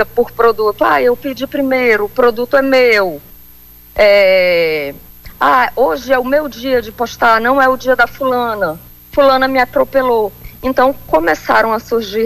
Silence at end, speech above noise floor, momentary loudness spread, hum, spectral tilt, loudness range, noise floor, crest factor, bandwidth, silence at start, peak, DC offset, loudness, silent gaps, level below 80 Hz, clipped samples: 0 s; 27 dB; 10 LU; 60 Hz at -45 dBFS; -4.5 dB/octave; 2 LU; -40 dBFS; 12 dB; 15 kHz; 0 s; -2 dBFS; under 0.1%; -13 LUFS; none; -40 dBFS; under 0.1%